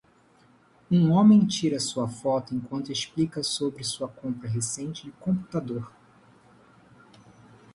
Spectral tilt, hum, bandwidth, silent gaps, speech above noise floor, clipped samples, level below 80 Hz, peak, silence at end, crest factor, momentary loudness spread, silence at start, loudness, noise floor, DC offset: -5.5 dB/octave; none; 11.5 kHz; none; 34 dB; under 0.1%; -62 dBFS; -8 dBFS; 1.85 s; 18 dB; 16 LU; 0.9 s; -26 LUFS; -60 dBFS; under 0.1%